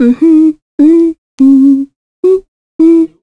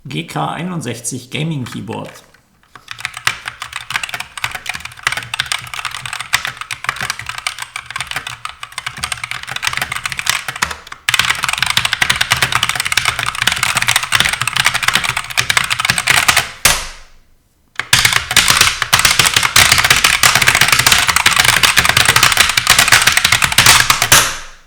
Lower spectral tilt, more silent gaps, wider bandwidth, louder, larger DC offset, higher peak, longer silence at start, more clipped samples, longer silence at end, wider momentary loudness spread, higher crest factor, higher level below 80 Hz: first, -7.5 dB/octave vs -0.5 dB/octave; first, 0.62-0.78 s, 1.18-1.38 s, 1.96-2.23 s, 2.48-2.79 s vs none; second, 4.7 kHz vs over 20 kHz; first, -8 LUFS vs -12 LUFS; neither; about the same, 0 dBFS vs 0 dBFS; about the same, 0 s vs 0.05 s; second, under 0.1% vs 0.4%; about the same, 0.15 s vs 0.1 s; second, 8 LU vs 15 LU; second, 8 dB vs 16 dB; second, -50 dBFS vs -38 dBFS